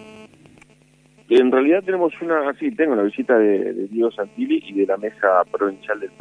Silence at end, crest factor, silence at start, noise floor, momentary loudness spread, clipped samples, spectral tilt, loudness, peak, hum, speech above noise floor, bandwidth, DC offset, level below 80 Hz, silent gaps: 0.15 s; 16 dB; 0 s; -54 dBFS; 8 LU; under 0.1%; -6.5 dB/octave; -19 LUFS; -2 dBFS; none; 35 dB; 9.6 kHz; under 0.1%; -70 dBFS; none